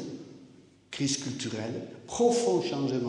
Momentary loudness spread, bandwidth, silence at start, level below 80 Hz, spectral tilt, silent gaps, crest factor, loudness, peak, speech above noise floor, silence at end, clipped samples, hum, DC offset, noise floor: 17 LU; 11 kHz; 0 s; -68 dBFS; -4.5 dB/octave; none; 18 dB; -29 LUFS; -12 dBFS; 26 dB; 0 s; under 0.1%; none; under 0.1%; -55 dBFS